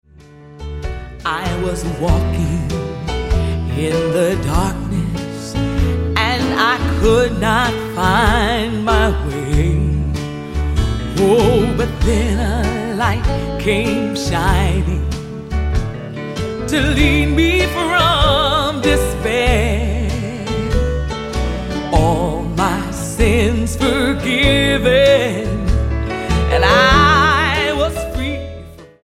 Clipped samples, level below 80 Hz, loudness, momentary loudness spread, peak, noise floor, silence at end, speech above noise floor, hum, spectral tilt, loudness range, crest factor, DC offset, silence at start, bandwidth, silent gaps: under 0.1%; -22 dBFS; -16 LUFS; 10 LU; 0 dBFS; -40 dBFS; 0.2 s; 26 dB; none; -5.5 dB/octave; 5 LU; 16 dB; under 0.1%; 0.4 s; 15.5 kHz; none